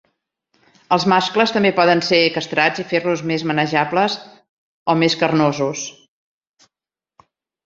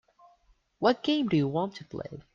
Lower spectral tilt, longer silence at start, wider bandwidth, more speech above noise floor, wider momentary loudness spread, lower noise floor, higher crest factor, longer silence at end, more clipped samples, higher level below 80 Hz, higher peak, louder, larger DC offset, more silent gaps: second, -4.5 dB/octave vs -7 dB/octave; about the same, 0.9 s vs 0.8 s; about the same, 7.8 kHz vs 7.2 kHz; first, 72 dB vs 38 dB; second, 8 LU vs 14 LU; first, -90 dBFS vs -66 dBFS; about the same, 18 dB vs 20 dB; first, 1.75 s vs 0.15 s; neither; about the same, -62 dBFS vs -64 dBFS; first, -2 dBFS vs -10 dBFS; first, -17 LUFS vs -28 LUFS; neither; first, 4.49-4.86 s vs none